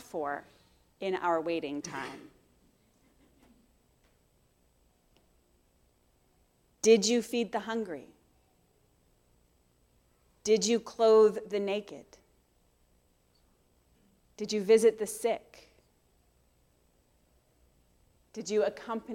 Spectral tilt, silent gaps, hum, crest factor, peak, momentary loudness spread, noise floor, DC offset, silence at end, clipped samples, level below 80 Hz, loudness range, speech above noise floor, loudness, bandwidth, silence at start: -3.5 dB/octave; none; none; 22 dB; -12 dBFS; 18 LU; -69 dBFS; under 0.1%; 0 s; under 0.1%; -72 dBFS; 12 LU; 40 dB; -29 LUFS; 15 kHz; 0.15 s